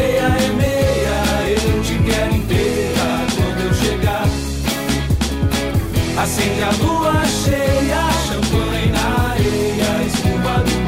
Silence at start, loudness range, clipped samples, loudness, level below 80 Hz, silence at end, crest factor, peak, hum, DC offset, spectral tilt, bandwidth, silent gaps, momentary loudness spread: 0 s; 2 LU; under 0.1%; -17 LUFS; -26 dBFS; 0 s; 12 dB; -6 dBFS; none; under 0.1%; -5 dB/octave; 16.5 kHz; none; 3 LU